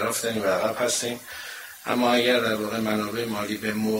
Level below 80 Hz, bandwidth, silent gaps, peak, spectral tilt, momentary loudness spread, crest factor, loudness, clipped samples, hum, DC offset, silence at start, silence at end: -62 dBFS; 16 kHz; none; -8 dBFS; -3 dB/octave; 14 LU; 18 dB; -25 LUFS; under 0.1%; none; under 0.1%; 0 s; 0 s